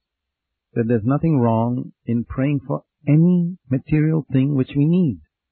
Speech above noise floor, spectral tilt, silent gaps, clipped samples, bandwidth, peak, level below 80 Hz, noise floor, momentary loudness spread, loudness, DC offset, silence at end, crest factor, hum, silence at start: 63 dB; -14 dB/octave; none; under 0.1%; 4.1 kHz; -6 dBFS; -46 dBFS; -82 dBFS; 9 LU; -20 LUFS; under 0.1%; 0.35 s; 14 dB; none; 0.75 s